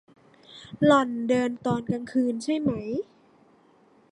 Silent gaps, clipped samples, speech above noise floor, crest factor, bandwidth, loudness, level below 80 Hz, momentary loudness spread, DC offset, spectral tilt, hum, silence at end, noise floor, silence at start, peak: none; under 0.1%; 34 dB; 20 dB; 11 kHz; -25 LUFS; -62 dBFS; 16 LU; under 0.1%; -6.5 dB/octave; none; 1.1 s; -59 dBFS; 0.5 s; -6 dBFS